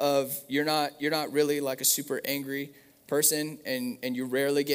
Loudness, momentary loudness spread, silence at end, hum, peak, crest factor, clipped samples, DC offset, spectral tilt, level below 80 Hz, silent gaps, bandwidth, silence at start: -28 LUFS; 8 LU; 0 s; none; -10 dBFS; 20 dB; under 0.1%; under 0.1%; -2.5 dB/octave; -78 dBFS; none; 16 kHz; 0 s